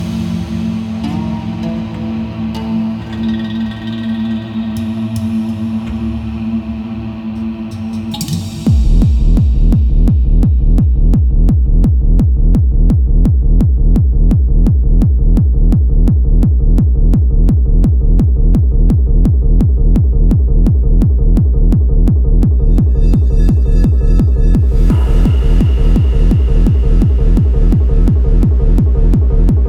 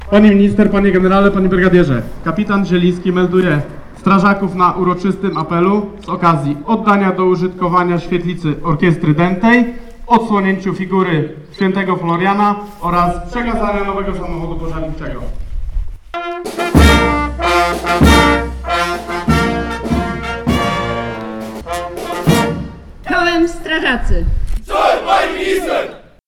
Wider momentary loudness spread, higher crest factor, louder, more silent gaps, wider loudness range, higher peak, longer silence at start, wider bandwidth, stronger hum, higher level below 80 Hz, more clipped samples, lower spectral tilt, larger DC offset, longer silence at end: second, 8 LU vs 13 LU; about the same, 10 dB vs 14 dB; about the same, -13 LUFS vs -14 LUFS; neither; about the same, 7 LU vs 5 LU; about the same, 0 dBFS vs 0 dBFS; about the same, 0 s vs 0 s; second, 7.8 kHz vs 17 kHz; neither; first, -10 dBFS vs -24 dBFS; neither; first, -9 dB/octave vs -6.5 dB/octave; neither; second, 0 s vs 0.3 s